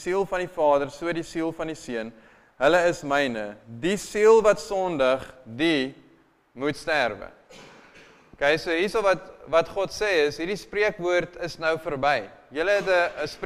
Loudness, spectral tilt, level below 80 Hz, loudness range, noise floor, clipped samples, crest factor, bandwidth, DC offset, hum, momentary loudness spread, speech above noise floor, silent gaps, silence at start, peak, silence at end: -24 LUFS; -4.5 dB/octave; -52 dBFS; 5 LU; -59 dBFS; under 0.1%; 18 dB; 15 kHz; under 0.1%; none; 12 LU; 35 dB; none; 0 s; -6 dBFS; 0 s